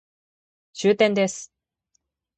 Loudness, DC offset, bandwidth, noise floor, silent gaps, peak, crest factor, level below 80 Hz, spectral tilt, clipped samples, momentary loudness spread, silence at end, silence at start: -21 LUFS; under 0.1%; 9 kHz; -73 dBFS; none; -6 dBFS; 20 dB; -68 dBFS; -4.5 dB/octave; under 0.1%; 22 LU; 0.9 s; 0.75 s